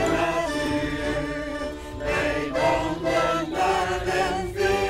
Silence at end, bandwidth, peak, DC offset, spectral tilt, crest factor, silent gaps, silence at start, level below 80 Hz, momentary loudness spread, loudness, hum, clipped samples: 0 s; 16 kHz; -10 dBFS; under 0.1%; -4.5 dB/octave; 14 dB; none; 0 s; -40 dBFS; 7 LU; -25 LUFS; none; under 0.1%